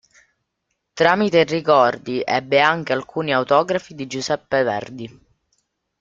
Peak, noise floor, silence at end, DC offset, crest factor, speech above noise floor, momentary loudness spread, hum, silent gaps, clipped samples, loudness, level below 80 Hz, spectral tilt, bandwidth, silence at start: 0 dBFS; -75 dBFS; 0.9 s; under 0.1%; 20 dB; 57 dB; 13 LU; none; none; under 0.1%; -19 LUFS; -60 dBFS; -5 dB/octave; 7.6 kHz; 0.95 s